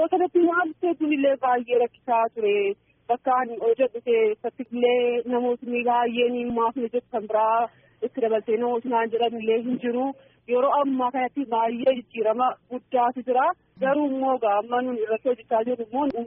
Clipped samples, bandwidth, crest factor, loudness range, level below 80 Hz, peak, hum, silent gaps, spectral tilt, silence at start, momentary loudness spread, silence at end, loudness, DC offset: under 0.1%; 3.7 kHz; 14 dB; 1 LU; -68 dBFS; -10 dBFS; none; none; 0.5 dB/octave; 0 s; 6 LU; 0 s; -24 LUFS; under 0.1%